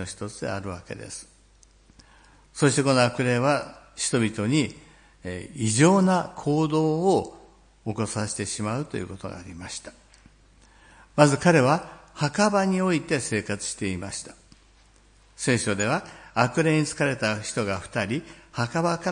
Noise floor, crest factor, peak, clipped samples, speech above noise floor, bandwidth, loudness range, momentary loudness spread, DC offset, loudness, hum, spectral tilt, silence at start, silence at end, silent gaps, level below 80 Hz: -56 dBFS; 24 dB; -2 dBFS; under 0.1%; 32 dB; 10.5 kHz; 6 LU; 17 LU; under 0.1%; -24 LUFS; none; -5 dB/octave; 0 s; 0 s; none; -56 dBFS